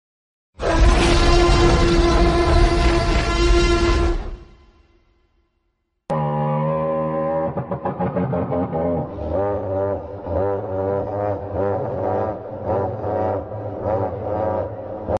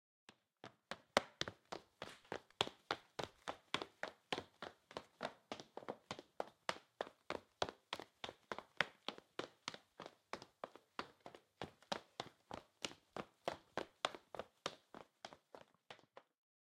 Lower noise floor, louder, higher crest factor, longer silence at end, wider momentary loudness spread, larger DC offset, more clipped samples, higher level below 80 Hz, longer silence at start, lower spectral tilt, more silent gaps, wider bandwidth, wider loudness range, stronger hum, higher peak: first, -71 dBFS vs -65 dBFS; first, -21 LUFS vs -48 LUFS; second, 16 dB vs 38 dB; second, 0 s vs 0.5 s; second, 10 LU vs 18 LU; neither; neither; first, -24 dBFS vs -80 dBFS; first, 0.6 s vs 0.3 s; first, -6 dB/octave vs -2.5 dB/octave; neither; second, 11 kHz vs 16 kHz; about the same, 7 LU vs 6 LU; neither; first, -4 dBFS vs -12 dBFS